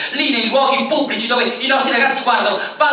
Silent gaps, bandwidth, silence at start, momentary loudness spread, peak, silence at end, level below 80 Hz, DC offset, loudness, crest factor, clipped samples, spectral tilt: none; 4 kHz; 0 s; 3 LU; -2 dBFS; 0 s; -72 dBFS; under 0.1%; -15 LUFS; 14 dB; under 0.1%; -7 dB/octave